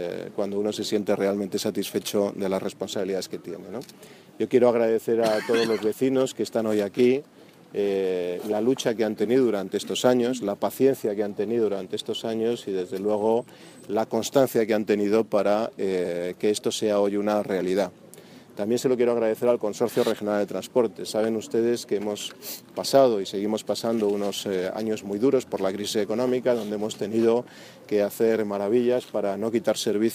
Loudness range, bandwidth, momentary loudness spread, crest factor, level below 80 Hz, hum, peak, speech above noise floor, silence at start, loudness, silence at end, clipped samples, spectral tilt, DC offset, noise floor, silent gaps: 2 LU; 15.5 kHz; 8 LU; 20 dB; -72 dBFS; none; -6 dBFS; 23 dB; 0 s; -25 LUFS; 0 s; under 0.1%; -5 dB/octave; under 0.1%; -47 dBFS; none